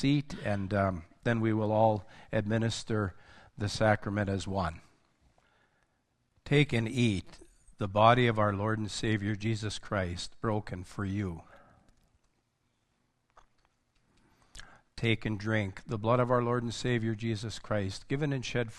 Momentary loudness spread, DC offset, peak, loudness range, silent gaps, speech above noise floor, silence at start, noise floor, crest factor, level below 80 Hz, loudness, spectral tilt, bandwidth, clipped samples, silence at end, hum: 10 LU; under 0.1%; -8 dBFS; 10 LU; none; 46 dB; 0 s; -76 dBFS; 24 dB; -54 dBFS; -31 LUFS; -6 dB/octave; 11 kHz; under 0.1%; 0 s; none